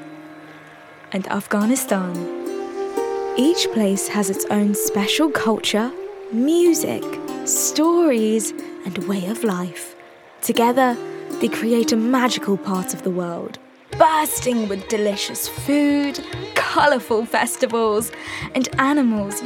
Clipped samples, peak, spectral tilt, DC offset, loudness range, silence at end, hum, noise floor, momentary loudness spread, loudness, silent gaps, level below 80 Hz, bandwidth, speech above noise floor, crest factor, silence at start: under 0.1%; -2 dBFS; -4 dB/octave; under 0.1%; 3 LU; 0 s; none; -43 dBFS; 12 LU; -20 LUFS; none; -54 dBFS; 19 kHz; 23 dB; 20 dB; 0 s